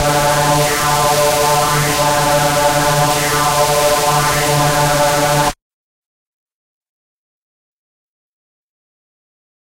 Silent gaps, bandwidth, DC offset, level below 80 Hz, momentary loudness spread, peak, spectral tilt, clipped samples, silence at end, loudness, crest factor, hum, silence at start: none; 16 kHz; under 0.1%; -36 dBFS; 1 LU; -2 dBFS; -3 dB/octave; under 0.1%; 4.15 s; -13 LUFS; 14 dB; none; 0 s